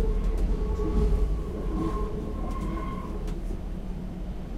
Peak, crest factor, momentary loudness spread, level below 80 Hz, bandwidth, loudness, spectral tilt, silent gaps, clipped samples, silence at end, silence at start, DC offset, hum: -14 dBFS; 14 dB; 9 LU; -28 dBFS; 9.4 kHz; -32 LUFS; -8 dB/octave; none; under 0.1%; 0 s; 0 s; under 0.1%; none